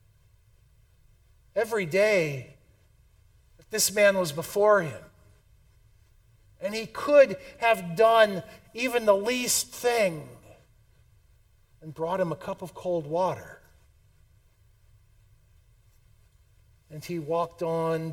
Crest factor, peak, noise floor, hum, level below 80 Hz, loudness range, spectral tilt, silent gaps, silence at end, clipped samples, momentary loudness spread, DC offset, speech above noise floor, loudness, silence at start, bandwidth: 22 dB; -6 dBFS; -61 dBFS; none; -62 dBFS; 11 LU; -3.5 dB/octave; none; 0 s; under 0.1%; 17 LU; under 0.1%; 35 dB; -25 LUFS; 1.55 s; 18.5 kHz